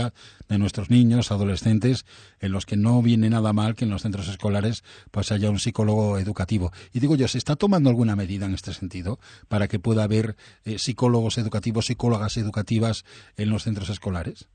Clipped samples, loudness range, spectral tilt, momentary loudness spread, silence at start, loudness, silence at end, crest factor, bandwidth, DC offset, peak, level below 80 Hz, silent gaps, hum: under 0.1%; 4 LU; -6.5 dB/octave; 12 LU; 0 s; -24 LUFS; 0.1 s; 16 dB; 9.6 kHz; under 0.1%; -6 dBFS; -48 dBFS; none; none